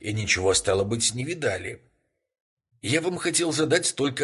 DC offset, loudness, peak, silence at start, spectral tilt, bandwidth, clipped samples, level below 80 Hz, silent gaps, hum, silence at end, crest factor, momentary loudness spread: under 0.1%; -24 LUFS; -8 dBFS; 0 s; -3 dB/octave; 12 kHz; under 0.1%; -50 dBFS; 2.40-2.57 s; none; 0 s; 18 dB; 7 LU